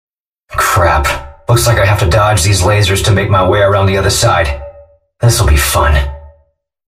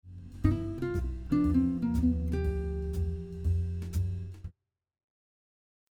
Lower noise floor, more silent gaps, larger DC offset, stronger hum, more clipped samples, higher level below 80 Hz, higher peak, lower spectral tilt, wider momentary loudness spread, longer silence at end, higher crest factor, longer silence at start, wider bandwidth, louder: second, -56 dBFS vs -64 dBFS; neither; neither; neither; neither; first, -20 dBFS vs -38 dBFS; first, 0 dBFS vs -12 dBFS; second, -4.5 dB/octave vs -9 dB/octave; second, 6 LU vs 11 LU; second, 0.6 s vs 1.4 s; second, 12 dB vs 20 dB; first, 0.5 s vs 0.05 s; first, 15.5 kHz vs 14 kHz; first, -11 LUFS vs -31 LUFS